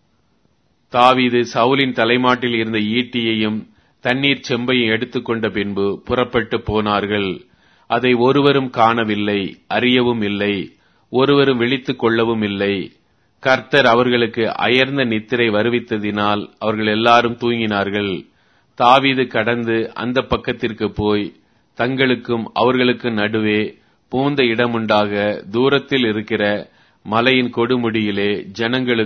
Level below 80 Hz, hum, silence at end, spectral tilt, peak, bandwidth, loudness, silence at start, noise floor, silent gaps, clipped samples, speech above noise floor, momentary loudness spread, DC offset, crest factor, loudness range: -48 dBFS; none; 0 s; -6.5 dB/octave; 0 dBFS; 6.6 kHz; -17 LUFS; 0.95 s; -61 dBFS; none; under 0.1%; 45 dB; 8 LU; under 0.1%; 18 dB; 3 LU